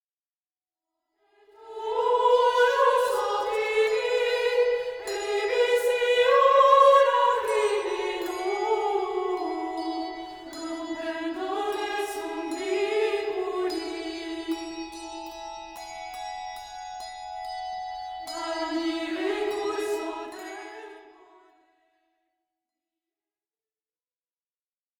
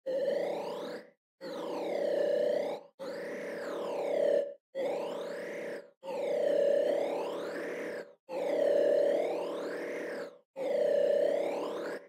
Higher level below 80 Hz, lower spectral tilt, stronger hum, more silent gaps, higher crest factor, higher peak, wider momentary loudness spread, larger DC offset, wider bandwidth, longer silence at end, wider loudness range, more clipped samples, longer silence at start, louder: first, -64 dBFS vs under -90 dBFS; second, -2 dB/octave vs -4.5 dB/octave; neither; second, none vs 1.17-1.38 s, 2.94-2.98 s, 4.60-4.73 s, 5.97-6.01 s, 8.20-8.27 s, 10.45-10.54 s; first, 20 dB vs 14 dB; first, -6 dBFS vs -18 dBFS; first, 18 LU vs 14 LU; neither; first, 19.5 kHz vs 14.5 kHz; first, 3.9 s vs 0 s; first, 15 LU vs 4 LU; neither; first, 1.6 s vs 0.05 s; first, -25 LUFS vs -33 LUFS